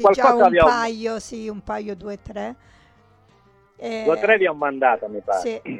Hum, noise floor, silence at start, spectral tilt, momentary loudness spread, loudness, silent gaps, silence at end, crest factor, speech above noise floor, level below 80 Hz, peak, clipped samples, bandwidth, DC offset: none; -56 dBFS; 0 s; -5 dB/octave; 18 LU; -19 LUFS; none; 0 s; 18 dB; 36 dB; -48 dBFS; -4 dBFS; under 0.1%; 11 kHz; under 0.1%